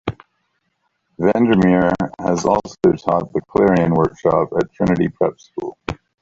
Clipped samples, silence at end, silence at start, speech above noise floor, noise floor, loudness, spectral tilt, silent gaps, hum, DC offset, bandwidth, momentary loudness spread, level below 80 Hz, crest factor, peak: under 0.1%; 0.3 s; 0.05 s; 53 dB; -69 dBFS; -17 LUFS; -7.5 dB/octave; none; none; under 0.1%; 7.8 kHz; 14 LU; -44 dBFS; 18 dB; 0 dBFS